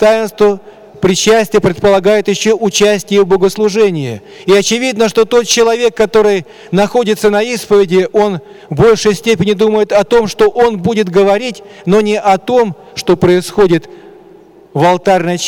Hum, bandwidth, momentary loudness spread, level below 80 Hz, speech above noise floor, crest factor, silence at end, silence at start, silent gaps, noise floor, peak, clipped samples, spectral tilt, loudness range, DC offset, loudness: none; 17.5 kHz; 6 LU; -42 dBFS; 29 dB; 8 dB; 0 s; 0 s; none; -39 dBFS; -2 dBFS; under 0.1%; -4.5 dB/octave; 1 LU; under 0.1%; -11 LUFS